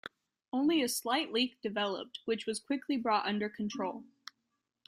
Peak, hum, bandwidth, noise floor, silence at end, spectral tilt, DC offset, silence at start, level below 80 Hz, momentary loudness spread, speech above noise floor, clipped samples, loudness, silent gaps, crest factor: -16 dBFS; none; 16 kHz; -84 dBFS; 0.85 s; -3.5 dB/octave; under 0.1%; 0.55 s; -78 dBFS; 16 LU; 50 dB; under 0.1%; -33 LUFS; none; 18 dB